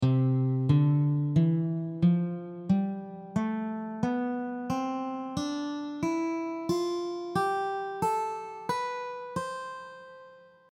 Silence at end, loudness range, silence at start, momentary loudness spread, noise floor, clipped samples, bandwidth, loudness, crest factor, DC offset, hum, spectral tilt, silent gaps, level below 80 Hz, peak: 0.3 s; 5 LU; 0 s; 11 LU; -53 dBFS; under 0.1%; 12.5 kHz; -30 LUFS; 16 dB; under 0.1%; none; -7.5 dB/octave; none; -62 dBFS; -12 dBFS